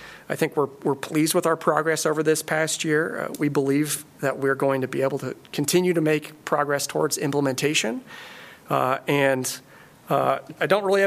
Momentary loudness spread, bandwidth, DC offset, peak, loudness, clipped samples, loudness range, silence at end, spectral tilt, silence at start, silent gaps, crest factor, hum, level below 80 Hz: 8 LU; 15.5 kHz; under 0.1%; -6 dBFS; -23 LUFS; under 0.1%; 2 LU; 0 s; -4 dB/octave; 0 s; none; 18 dB; none; -70 dBFS